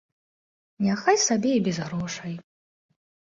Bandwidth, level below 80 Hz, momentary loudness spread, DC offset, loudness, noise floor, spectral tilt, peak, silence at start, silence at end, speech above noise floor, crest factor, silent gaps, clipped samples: 7.8 kHz; -64 dBFS; 14 LU; under 0.1%; -24 LUFS; under -90 dBFS; -4 dB/octave; -6 dBFS; 0.8 s; 0.85 s; over 66 dB; 20 dB; none; under 0.1%